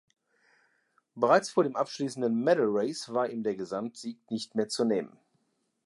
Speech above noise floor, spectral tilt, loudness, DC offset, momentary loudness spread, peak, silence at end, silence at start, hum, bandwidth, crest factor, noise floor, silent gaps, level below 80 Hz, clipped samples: 46 dB; -5 dB/octave; -29 LUFS; under 0.1%; 12 LU; -10 dBFS; 0.8 s; 1.15 s; none; 11.5 kHz; 22 dB; -75 dBFS; none; -80 dBFS; under 0.1%